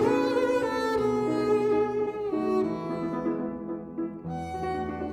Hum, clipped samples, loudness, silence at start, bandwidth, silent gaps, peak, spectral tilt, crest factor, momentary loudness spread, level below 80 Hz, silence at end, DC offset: none; under 0.1%; -28 LUFS; 0 s; 13.5 kHz; none; -12 dBFS; -6.5 dB/octave; 14 dB; 10 LU; -54 dBFS; 0 s; under 0.1%